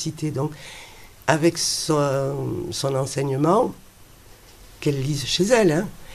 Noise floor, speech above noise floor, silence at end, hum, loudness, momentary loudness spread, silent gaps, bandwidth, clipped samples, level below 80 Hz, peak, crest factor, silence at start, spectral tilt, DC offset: -47 dBFS; 25 dB; 0 s; none; -22 LUFS; 10 LU; none; 14.5 kHz; under 0.1%; -50 dBFS; -2 dBFS; 22 dB; 0 s; -4.5 dB/octave; under 0.1%